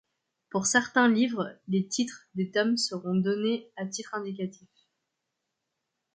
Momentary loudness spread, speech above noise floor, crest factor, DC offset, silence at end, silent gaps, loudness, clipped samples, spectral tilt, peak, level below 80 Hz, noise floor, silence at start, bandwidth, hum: 12 LU; 55 dB; 20 dB; under 0.1%; 1.65 s; none; -28 LUFS; under 0.1%; -4 dB/octave; -10 dBFS; -76 dBFS; -83 dBFS; 0.55 s; 9.6 kHz; none